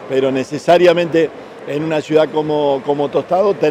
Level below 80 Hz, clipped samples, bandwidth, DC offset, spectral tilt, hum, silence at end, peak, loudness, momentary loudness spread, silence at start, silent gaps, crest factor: -60 dBFS; under 0.1%; 13 kHz; under 0.1%; -6 dB/octave; none; 0 s; -2 dBFS; -15 LUFS; 9 LU; 0 s; none; 12 dB